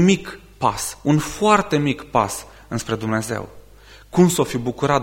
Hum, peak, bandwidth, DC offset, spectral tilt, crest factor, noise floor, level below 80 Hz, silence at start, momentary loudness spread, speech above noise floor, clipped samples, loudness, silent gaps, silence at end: none; -2 dBFS; 16.5 kHz; under 0.1%; -5.5 dB/octave; 18 dB; -45 dBFS; -46 dBFS; 0 s; 12 LU; 26 dB; under 0.1%; -20 LUFS; none; 0 s